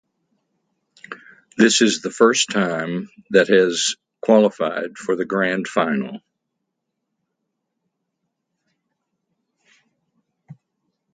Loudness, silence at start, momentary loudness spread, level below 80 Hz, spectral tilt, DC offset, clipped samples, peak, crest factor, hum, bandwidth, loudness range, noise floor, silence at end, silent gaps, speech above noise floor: -18 LUFS; 1.1 s; 20 LU; -68 dBFS; -3.5 dB/octave; under 0.1%; under 0.1%; 0 dBFS; 22 dB; none; 9.6 kHz; 9 LU; -78 dBFS; 0.6 s; none; 60 dB